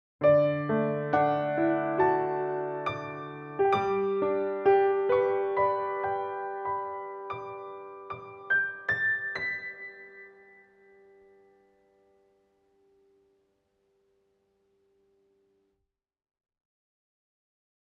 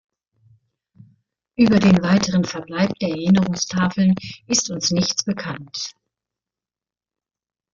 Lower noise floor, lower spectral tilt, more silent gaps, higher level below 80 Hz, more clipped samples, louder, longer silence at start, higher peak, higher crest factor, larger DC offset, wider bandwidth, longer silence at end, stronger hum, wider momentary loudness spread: second, -81 dBFS vs under -90 dBFS; first, -8 dB/octave vs -4.5 dB/octave; neither; second, -72 dBFS vs -54 dBFS; neither; second, -28 LUFS vs -19 LUFS; second, 0.2 s vs 1.6 s; second, -12 dBFS vs -4 dBFS; about the same, 20 dB vs 18 dB; neither; second, 6.4 kHz vs 7.4 kHz; first, 7.6 s vs 1.85 s; neither; first, 17 LU vs 14 LU